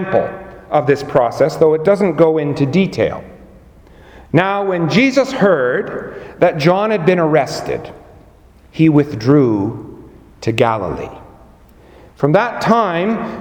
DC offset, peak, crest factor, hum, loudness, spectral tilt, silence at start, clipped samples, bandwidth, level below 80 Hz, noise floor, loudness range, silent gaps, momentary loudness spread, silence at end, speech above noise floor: under 0.1%; 0 dBFS; 16 dB; none; -15 LUFS; -7 dB/octave; 0 s; under 0.1%; 17 kHz; -46 dBFS; -45 dBFS; 3 LU; none; 13 LU; 0 s; 30 dB